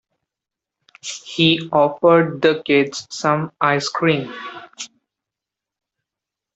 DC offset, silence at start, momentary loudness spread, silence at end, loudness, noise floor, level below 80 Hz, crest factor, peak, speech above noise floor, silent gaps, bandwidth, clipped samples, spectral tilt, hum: under 0.1%; 1.05 s; 19 LU; 1.7 s; -17 LUFS; -86 dBFS; -64 dBFS; 18 dB; -2 dBFS; 69 dB; none; 8.2 kHz; under 0.1%; -5 dB/octave; none